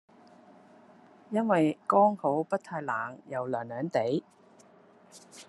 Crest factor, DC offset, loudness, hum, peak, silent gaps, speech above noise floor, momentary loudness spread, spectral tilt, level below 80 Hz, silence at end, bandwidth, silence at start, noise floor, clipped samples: 20 dB; under 0.1%; -29 LUFS; none; -10 dBFS; none; 29 dB; 11 LU; -7 dB/octave; -82 dBFS; 0.05 s; 12 kHz; 1.3 s; -58 dBFS; under 0.1%